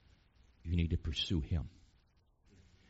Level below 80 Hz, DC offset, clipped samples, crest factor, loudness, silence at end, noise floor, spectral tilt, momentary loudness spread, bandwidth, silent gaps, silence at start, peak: -46 dBFS; under 0.1%; under 0.1%; 18 dB; -37 LUFS; 1.2 s; -71 dBFS; -5.5 dB/octave; 13 LU; 7.6 kHz; none; 0.65 s; -22 dBFS